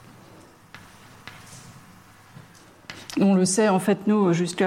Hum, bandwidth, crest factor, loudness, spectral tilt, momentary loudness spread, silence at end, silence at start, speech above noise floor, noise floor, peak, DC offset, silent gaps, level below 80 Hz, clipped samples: none; 15 kHz; 16 dB; -21 LUFS; -5.5 dB/octave; 25 LU; 0 s; 0.75 s; 30 dB; -50 dBFS; -10 dBFS; under 0.1%; none; -64 dBFS; under 0.1%